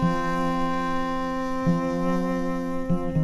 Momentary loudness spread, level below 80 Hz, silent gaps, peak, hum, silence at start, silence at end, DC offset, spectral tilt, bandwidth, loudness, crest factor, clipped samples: 3 LU; -38 dBFS; none; -12 dBFS; none; 0 s; 0 s; under 0.1%; -7.5 dB/octave; 12.5 kHz; -26 LUFS; 14 dB; under 0.1%